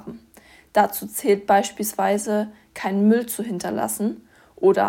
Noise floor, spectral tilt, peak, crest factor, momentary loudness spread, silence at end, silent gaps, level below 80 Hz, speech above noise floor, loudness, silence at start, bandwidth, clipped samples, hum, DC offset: -51 dBFS; -5 dB/octave; -4 dBFS; 18 dB; 9 LU; 0 s; none; -62 dBFS; 30 dB; -22 LUFS; 0.05 s; 17.5 kHz; under 0.1%; none; under 0.1%